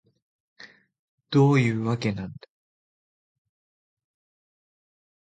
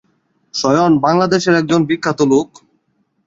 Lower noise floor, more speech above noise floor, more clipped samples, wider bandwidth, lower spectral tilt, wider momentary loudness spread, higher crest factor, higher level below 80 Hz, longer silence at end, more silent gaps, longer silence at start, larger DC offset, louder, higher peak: first, under -90 dBFS vs -64 dBFS; first, over 68 dB vs 50 dB; neither; first, 9 kHz vs 7.8 kHz; first, -7.5 dB/octave vs -5.5 dB/octave; first, 14 LU vs 7 LU; first, 20 dB vs 14 dB; second, -62 dBFS vs -54 dBFS; first, 2.85 s vs 0.8 s; first, 0.99-1.18 s vs none; about the same, 0.6 s vs 0.55 s; neither; second, -23 LUFS vs -14 LUFS; second, -8 dBFS vs 0 dBFS